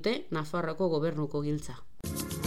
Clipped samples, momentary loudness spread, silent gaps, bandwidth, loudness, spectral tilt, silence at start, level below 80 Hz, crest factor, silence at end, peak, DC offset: under 0.1%; 9 LU; none; 16 kHz; -33 LUFS; -5.5 dB/octave; 0 s; -54 dBFS; 16 dB; 0 s; -18 dBFS; 0.9%